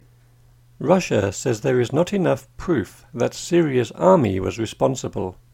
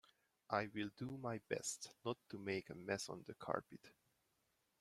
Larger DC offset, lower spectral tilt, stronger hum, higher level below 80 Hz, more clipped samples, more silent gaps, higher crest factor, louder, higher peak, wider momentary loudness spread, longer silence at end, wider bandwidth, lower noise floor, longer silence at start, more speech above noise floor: neither; first, -6 dB/octave vs -4 dB/octave; neither; first, -48 dBFS vs -80 dBFS; neither; neither; second, 20 dB vs 26 dB; first, -21 LUFS vs -46 LUFS; first, 0 dBFS vs -22 dBFS; first, 10 LU vs 6 LU; second, 0.2 s vs 0.9 s; about the same, 16 kHz vs 16 kHz; second, -53 dBFS vs -84 dBFS; first, 0.8 s vs 0.5 s; second, 32 dB vs 38 dB